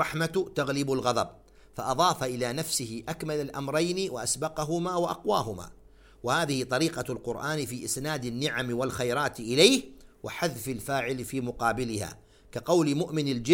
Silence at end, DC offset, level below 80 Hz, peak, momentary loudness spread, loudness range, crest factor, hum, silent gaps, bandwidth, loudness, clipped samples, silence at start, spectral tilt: 0 s; under 0.1%; -56 dBFS; -6 dBFS; 10 LU; 3 LU; 24 dB; none; none; 17 kHz; -29 LUFS; under 0.1%; 0 s; -4 dB/octave